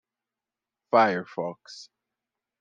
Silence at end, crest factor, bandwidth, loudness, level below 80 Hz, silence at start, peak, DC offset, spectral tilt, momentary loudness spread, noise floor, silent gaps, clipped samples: 0.75 s; 22 dB; 9.2 kHz; -25 LUFS; -84 dBFS; 0.95 s; -6 dBFS; under 0.1%; -5.5 dB/octave; 23 LU; -90 dBFS; none; under 0.1%